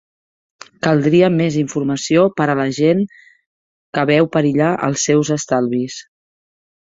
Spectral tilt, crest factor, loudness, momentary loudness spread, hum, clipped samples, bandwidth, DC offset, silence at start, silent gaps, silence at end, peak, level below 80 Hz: -5.5 dB/octave; 16 dB; -16 LUFS; 9 LU; none; under 0.1%; 8 kHz; under 0.1%; 0.85 s; 3.46-3.93 s; 0.95 s; -2 dBFS; -56 dBFS